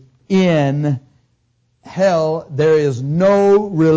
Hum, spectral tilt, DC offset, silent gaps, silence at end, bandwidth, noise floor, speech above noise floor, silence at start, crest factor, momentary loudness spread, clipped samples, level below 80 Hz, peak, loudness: none; -7.5 dB/octave; under 0.1%; none; 0 s; 8 kHz; -62 dBFS; 48 dB; 0.3 s; 10 dB; 8 LU; under 0.1%; -52 dBFS; -4 dBFS; -15 LUFS